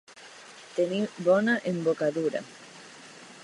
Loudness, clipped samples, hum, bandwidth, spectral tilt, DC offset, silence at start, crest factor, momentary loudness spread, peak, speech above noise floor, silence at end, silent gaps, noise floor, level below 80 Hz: -27 LUFS; under 0.1%; none; 11.5 kHz; -6 dB/octave; under 0.1%; 0.1 s; 18 dB; 22 LU; -10 dBFS; 22 dB; 0 s; none; -49 dBFS; -80 dBFS